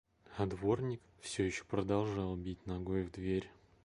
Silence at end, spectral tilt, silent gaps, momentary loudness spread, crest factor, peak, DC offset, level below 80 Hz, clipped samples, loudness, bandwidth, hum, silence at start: 0.35 s; -6.5 dB/octave; none; 8 LU; 18 dB; -20 dBFS; under 0.1%; -56 dBFS; under 0.1%; -38 LUFS; 11.5 kHz; none; 0.3 s